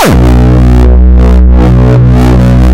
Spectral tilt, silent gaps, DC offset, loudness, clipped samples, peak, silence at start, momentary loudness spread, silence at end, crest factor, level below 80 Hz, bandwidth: -7.5 dB/octave; none; under 0.1%; -5 LUFS; 8%; 0 dBFS; 0 s; 0 LU; 0 s; 2 dB; -4 dBFS; 13.5 kHz